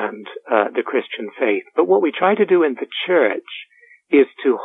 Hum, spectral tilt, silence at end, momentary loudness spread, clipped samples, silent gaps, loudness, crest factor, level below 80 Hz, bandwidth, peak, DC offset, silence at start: none; -8 dB/octave; 0 s; 12 LU; under 0.1%; none; -18 LUFS; 16 dB; -70 dBFS; 4 kHz; -2 dBFS; under 0.1%; 0 s